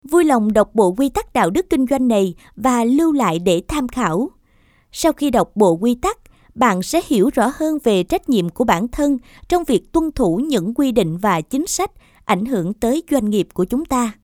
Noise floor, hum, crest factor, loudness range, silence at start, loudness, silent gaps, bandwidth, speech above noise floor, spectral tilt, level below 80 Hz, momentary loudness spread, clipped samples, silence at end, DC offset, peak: -55 dBFS; none; 18 dB; 2 LU; 0.05 s; -18 LUFS; none; 19 kHz; 38 dB; -5.5 dB/octave; -40 dBFS; 6 LU; under 0.1%; 0.1 s; under 0.1%; 0 dBFS